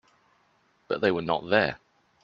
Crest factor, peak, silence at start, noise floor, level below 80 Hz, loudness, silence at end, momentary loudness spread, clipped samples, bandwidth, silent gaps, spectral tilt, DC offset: 24 dB; -6 dBFS; 0.9 s; -67 dBFS; -62 dBFS; -26 LUFS; 0.45 s; 9 LU; under 0.1%; 7.4 kHz; none; -7 dB/octave; under 0.1%